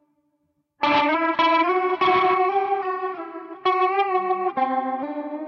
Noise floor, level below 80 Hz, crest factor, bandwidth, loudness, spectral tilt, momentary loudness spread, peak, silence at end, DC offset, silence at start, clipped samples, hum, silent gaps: -71 dBFS; -66 dBFS; 14 dB; 6.6 kHz; -21 LUFS; -5.5 dB/octave; 10 LU; -8 dBFS; 0 s; under 0.1%; 0.8 s; under 0.1%; none; none